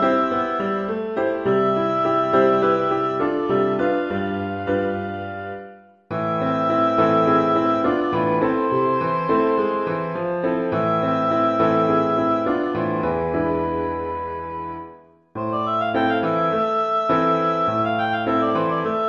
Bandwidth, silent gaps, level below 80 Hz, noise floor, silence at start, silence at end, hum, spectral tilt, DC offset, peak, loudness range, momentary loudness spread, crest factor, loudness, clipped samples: 7 kHz; none; -50 dBFS; -45 dBFS; 0 s; 0 s; none; -8 dB/octave; under 0.1%; -6 dBFS; 5 LU; 9 LU; 16 dB; -21 LUFS; under 0.1%